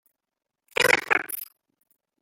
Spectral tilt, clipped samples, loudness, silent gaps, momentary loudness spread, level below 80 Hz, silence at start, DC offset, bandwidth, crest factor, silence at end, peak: -1.5 dB/octave; under 0.1%; -23 LUFS; none; 15 LU; -64 dBFS; 0.8 s; under 0.1%; 17 kHz; 26 dB; 0.8 s; -2 dBFS